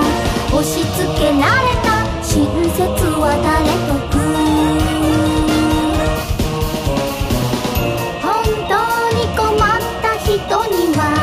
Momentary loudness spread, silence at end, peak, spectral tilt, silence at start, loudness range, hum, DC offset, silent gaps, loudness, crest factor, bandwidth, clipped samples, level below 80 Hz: 5 LU; 0 s; -2 dBFS; -5 dB/octave; 0 s; 2 LU; none; under 0.1%; none; -16 LUFS; 14 dB; 15.5 kHz; under 0.1%; -26 dBFS